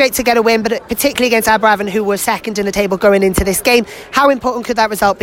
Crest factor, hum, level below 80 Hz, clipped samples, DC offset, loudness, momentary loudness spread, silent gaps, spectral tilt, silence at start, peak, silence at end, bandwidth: 12 dB; none; -36 dBFS; under 0.1%; under 0.1%; -13 LUFS; 6 LU; none; -3.5 dB/octave; 0 s; 0 dBFS; 0 s; 16.5 kHz